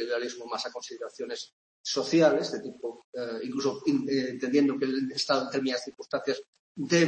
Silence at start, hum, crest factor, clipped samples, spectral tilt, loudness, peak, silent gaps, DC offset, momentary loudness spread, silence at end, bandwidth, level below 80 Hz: 0 s; none; 20 dB; under 0.1%; -4.5 dB/octave; -29 LUFS; -8 dBFS; 1.53-1.84 s, 3.04-3.13 s, 6.48-6.53 s, 6.59-6.75 s; under 0.1%; 14 LU; 0 s; 8.8 kHz; -76 dBFS